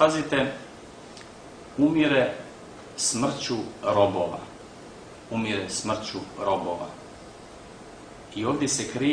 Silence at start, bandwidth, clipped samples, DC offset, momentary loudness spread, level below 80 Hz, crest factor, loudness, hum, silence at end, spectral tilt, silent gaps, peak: 0 s; 10.5 kHz; under 0.1%; under 0.1%; 22 LU; -58 dBFS; 22 dB; -26 LUFS; none; 0 s; -4 dB/octave; none; -6 dBFS